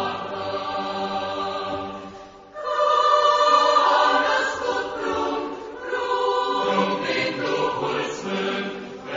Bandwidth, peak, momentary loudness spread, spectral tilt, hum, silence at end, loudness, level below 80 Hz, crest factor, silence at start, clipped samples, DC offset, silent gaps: 7.6 kHz; -6 dBFS; 15 LU; -3.5 dB/octave; none; 0 s; -22 LUFS; -58 dBFS; 18 dB; 0 s; under 0.1%; under 0.1%; none